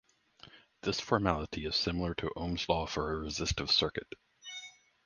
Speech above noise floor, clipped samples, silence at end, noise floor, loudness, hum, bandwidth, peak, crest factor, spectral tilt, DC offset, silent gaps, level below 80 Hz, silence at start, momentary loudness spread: 26 dB; under 0.1%; 0.35 s; -59 dBFS; -33 LUFS; none; 10 kHz; -12 dBFS; 24 dB; -4 dB/octave; under 0.1%; none; -48 dBFS; 0.45 s; 17 LU